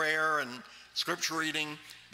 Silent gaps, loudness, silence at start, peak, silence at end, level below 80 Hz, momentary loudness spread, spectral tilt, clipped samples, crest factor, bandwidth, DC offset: none; -32 LUFS; 0 s; -16 dBFS; 0.05 s; -78 dBFS; 13 LU; -1.5 dB/octave; under 0.1%; 18 dB; 16 kHz; under 0.1%